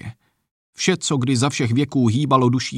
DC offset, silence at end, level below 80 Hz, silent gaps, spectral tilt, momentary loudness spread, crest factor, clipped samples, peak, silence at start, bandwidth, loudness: under 0.1%; 0 s; -58 dBFS; 0.51-0.73 s; -5 dB/octave; 4 LU; 16 dB; under 0.1%; -4 dBFS; 0.05 s; 11.5 kHz; -19 LUFS